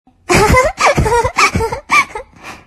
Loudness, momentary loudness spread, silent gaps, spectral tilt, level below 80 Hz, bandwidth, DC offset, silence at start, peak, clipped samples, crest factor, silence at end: -12 LUFS; 11 LU; none; -4 dB/octave; -26 dBFS; 13 kHz; under 0.1%; 0.3 s; 0 dBFS; under 0.1%; 14 dB; 0.1 s